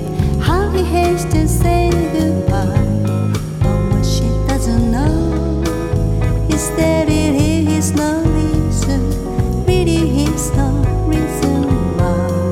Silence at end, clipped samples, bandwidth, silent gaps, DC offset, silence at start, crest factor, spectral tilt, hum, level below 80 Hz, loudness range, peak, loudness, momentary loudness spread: 0 s; under 0.1%; 16.5 kHz; none; under 0.1%; 0 s; 14 dB; -6.5 dB/octave; none; -22 dBFS; 1 LU; -2 dBFS; -16 LUFS; 3 LU